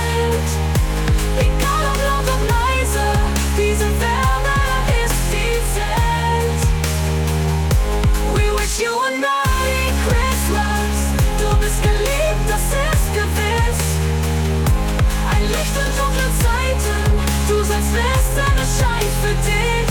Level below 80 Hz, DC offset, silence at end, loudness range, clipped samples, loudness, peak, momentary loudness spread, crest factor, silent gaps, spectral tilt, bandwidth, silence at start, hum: -20 dBFS; under 0.1%; 0 s; 1 LU; under 0.1%; -18 LUFS; -6 dBFS; 2 LU; 12 dB; none; -4.5 dB/octave; 18 kHz; 0 s; none